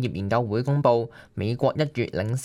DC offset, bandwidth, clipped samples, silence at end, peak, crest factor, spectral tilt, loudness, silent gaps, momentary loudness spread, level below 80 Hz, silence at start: under 0.1%; 11.5 kHz; under 0.1%; 0 s; -6 dBFS; 18 dB; -7 dB/octave; -25 LUFS; none; 8 LU; -56 dBFS; 0 s